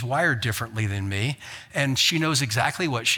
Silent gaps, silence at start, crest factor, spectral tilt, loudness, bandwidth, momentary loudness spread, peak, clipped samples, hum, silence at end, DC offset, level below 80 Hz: none; 0 s; 18 dB; -3.5 dB/octave; -24 LUFS; 19 kHz; 8 LU; -6 dBFS; under 0.1%; none; 0 s; under 0.1%; -58 dBFS